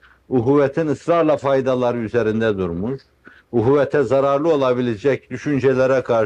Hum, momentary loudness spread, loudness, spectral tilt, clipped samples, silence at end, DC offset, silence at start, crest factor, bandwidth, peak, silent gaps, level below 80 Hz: none; 7 LU; -18 LUFS; -7.5 dB/octave; under 0.1%; 0 s; under 0.1%; 0.3 s; 14 dB; 9 kHz; -4 dBFS; none; -52 dBFS